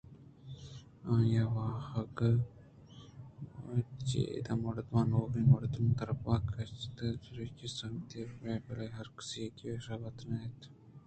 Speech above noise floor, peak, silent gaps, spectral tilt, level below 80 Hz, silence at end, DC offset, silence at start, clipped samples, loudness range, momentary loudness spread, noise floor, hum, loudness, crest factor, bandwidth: 21 dB; -14 dBFS; none; -7.5 dB/octave; -56 dBFS; 0.05 s; under 0.1%; 0.1 s; under 0.1%; 9 LU; 20 LU; -55 dBFS; none; -36 LUFS; 22 dB; 8.8 kHz